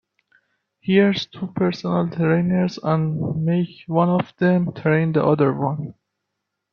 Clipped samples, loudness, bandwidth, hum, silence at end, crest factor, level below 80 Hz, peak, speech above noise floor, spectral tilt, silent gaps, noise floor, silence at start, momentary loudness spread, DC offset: under 0.1%; -20 LUFS; 6.6 kHz; none; 0.8 s; 18 dB; -60 dBFS; -2 dBFS; 59 dB; -8.5 dB/octave; none; -79 dBFS; 0.85 s; 8 LU; under 0.1%